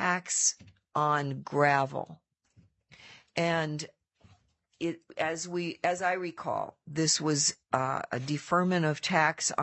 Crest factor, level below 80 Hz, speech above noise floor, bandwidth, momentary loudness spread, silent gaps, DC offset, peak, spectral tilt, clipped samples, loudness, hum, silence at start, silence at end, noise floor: 22 dB; -74 dBFS; 36 dB; 8.8 kHz; 11 LU; none; under 0.1%; -10 dBFS; -3.5 dB/octave; under 0.1%; -29 LUFS; none; 0 s; 0 s; -66 dBFS